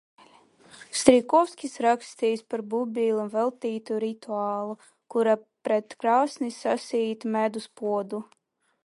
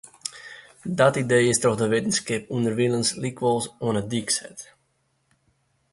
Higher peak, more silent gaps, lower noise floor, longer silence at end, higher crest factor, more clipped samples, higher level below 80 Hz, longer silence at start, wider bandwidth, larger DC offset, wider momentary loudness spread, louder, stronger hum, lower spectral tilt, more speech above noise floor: first, -2 dBFS vs -6 dBFS; neither; second, -56 dBFS vs -70 dBFS; second, 0.6 s vs 1.3 s; first, 26 dB vs 20 dB; neither; second, -68 dBFS vs -60 dBFS; first, 0.75 s vs 0.25 s; about the same, 11.5 kHz vs 11.5 kHz; neither; second, 10 LU vs 16 LU; second, -26 LUFS vs -23 LUFS; neither; about the same, -4 dB/octave vs -4 dB/octave; second, 30 dB vs 47 dB